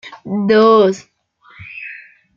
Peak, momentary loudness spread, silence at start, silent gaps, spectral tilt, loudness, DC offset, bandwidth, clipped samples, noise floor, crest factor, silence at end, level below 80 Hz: -2 dBFS; 22 LU; 0.05 s; none; -6.5 dB/octave; -13 LUFS; under 0.1%; 7.4 kHz; under 0.1%; -48 dBFS; 14 dB; 0.4 s; -60 dBFS